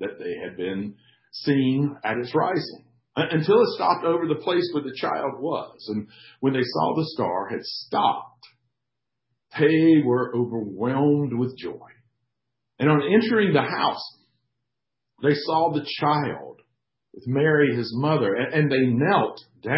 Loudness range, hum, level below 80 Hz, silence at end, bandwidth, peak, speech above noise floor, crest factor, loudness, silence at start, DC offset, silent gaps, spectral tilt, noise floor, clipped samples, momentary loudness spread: 4 LU; none; -66 dBFS; 0 s; 5.8 kHz; -6 dBFS; 62 dB; 18 dB; -23 LUFS; 0 s; under 0.1%; none; -10.5 dB/octave; -84 dBFS; under 0.1%; 13 LU